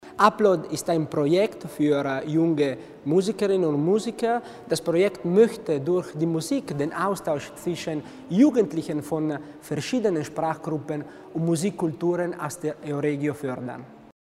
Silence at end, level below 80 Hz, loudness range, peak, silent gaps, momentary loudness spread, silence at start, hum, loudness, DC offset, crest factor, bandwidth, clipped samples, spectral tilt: 0.25 s; -64 dBFS; 4 LU; -4 dBFS; none; 11 LU; 0 s; none; -25 LUFS; under 0.1%; 22 dB; 15.5 kHz; under 0.1%; -6 dB/octave